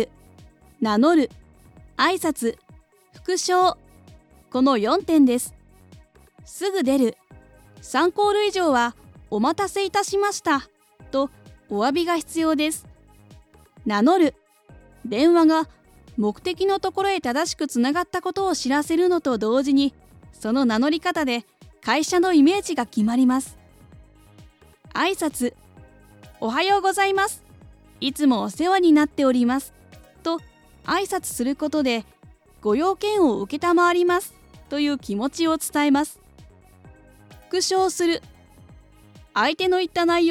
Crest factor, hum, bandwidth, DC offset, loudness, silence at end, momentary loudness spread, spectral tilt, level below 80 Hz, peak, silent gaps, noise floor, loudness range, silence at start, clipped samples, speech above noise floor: 16 dB; none; 16 kHz; under 0.1%; -22 LUFS; 0 s; 11 LU; -3.5 dB/octave; -54 dBFS; -6 dBFS; none; -52 dBFS; 4 LU; 0 s; under 0.1%; 32 dB